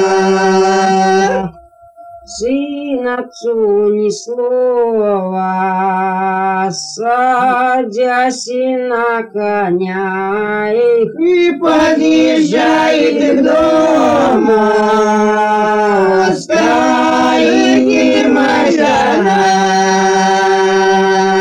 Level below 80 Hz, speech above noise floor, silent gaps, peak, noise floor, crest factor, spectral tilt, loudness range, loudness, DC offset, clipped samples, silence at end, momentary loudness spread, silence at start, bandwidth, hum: -50 dBFS; 28 dB; none; 0 dBFS; -39 dBFS; 10 dB; -4.5 dB/octave; 4 LU; -12 LUFS; under 0.1%; under 0.1%; 0 s; 7 LU; 0 s; 10.5 kHz; none